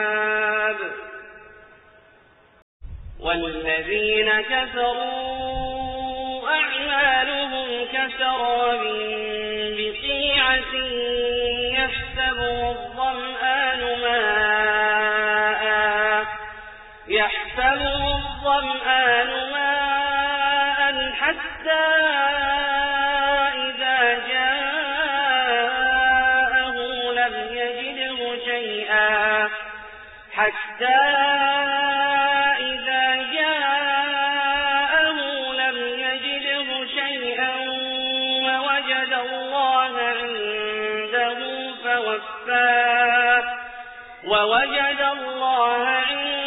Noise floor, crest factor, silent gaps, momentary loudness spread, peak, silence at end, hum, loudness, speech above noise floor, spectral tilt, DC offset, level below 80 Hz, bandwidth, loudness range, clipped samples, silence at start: -54 dBFS; 16 dB; 2.62-2.80 s; 9 LU; -6 dBFS; 0 s; none; -21 LUFS; 31 dB; 1.5 dB/octave; under 0.1%; -46 dBFS; 4 kHz; 3 LU; under 0.1%; 0 s